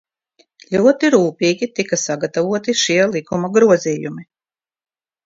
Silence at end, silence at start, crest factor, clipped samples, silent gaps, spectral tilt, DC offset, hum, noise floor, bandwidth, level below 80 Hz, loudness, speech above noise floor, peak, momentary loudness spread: 1 s; 0.7 s; 18 dB; under 0.1%; none; -4 dB/octave; under 0.1%; none; under -90 dBFS; 7.8 kHz; -60 dBFS; -16 LUFS; over 74 dB; 0 dBFS; 9 LU